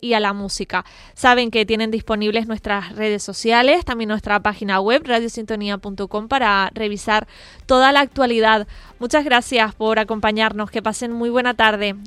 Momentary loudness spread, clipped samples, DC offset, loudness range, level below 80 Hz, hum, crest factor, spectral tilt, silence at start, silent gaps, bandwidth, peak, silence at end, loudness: 10 LU; under 0.1%; under 0.1%; 3 LU; -44 dBFS; none; 18 dB; -3.5 dB/octave; 0 s; none; 13.5 kHz; 0 dBFS; 0 s; -18 LUFS